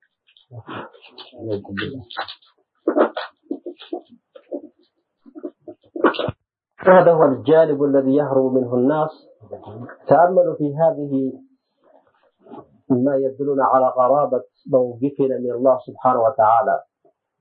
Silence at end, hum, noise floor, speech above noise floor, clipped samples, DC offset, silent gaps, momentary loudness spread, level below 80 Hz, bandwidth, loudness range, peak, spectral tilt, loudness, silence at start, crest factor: 0.6 s; none; -64 dBFS; 47 dB; under 0.1%; under 0.1%; none; 20 LU; -64 dBFS; 4.9 kHz; 11 LU; 0 dBFS; -11.5 dB/octave; -18 LUFS; 0.55 s; 20 dB